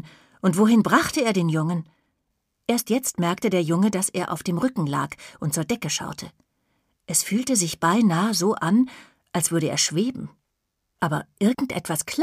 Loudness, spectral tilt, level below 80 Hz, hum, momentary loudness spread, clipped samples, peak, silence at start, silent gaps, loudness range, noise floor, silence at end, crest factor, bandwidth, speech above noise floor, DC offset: -23 LUFS; -4.5 dB/octave; -60 dBFS; none; 9 LU; under 0.1%; -4 dBFS; 0.05 s; none; 4 LU; -77 dBFS; 0 s; 18 dB; 15.5 kHz; 55 dB; under 0.1%